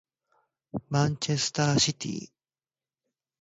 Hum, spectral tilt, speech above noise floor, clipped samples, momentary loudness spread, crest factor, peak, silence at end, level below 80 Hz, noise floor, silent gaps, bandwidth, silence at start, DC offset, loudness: none; -4 dB/octave; over 63 dB; under 0.1%; 16 LU; 18 dB; -12 dBFS; 1.15 s; -62 dBFS; under -90 dBFS; none; 8 kHz; 0.75 s; under 0.1%; -27 LUFS